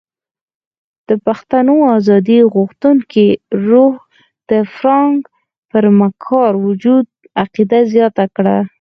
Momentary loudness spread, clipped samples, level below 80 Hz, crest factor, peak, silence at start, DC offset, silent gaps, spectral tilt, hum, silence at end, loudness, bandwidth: 7 LU; under 0.1%; -58 dBFS; 12 dB; 0 dBFS; 1.1 s; under 0.1%; 5.58-5.69 s; -9 dB/octave; none; 0.1 s; -12 LUFS; 6.2 kHz